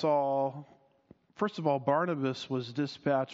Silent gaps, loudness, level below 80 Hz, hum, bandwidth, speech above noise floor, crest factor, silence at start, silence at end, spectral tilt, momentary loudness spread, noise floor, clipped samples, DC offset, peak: none; -31 LUFS; -76 dBFS; none; 7.6 kHz; 32 dB; 18 dB; 0 s; 0 s; -5 dB/octave; 7 LU; -62 dBFS; under 0.1%; under 0.1%; -14 dBFS